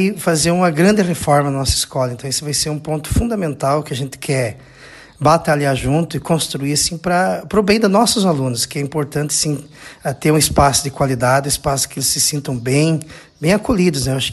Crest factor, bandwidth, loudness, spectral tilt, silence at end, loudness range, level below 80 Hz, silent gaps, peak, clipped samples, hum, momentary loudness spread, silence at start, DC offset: 16 dB; 13 kHz; -16 LUFS; -4.5 dB/octave; 0 s; 3 LU; -36 dBFS; none; 0 dBFS; under 0.1%; none; 8 LU; 0 s; under 0.1%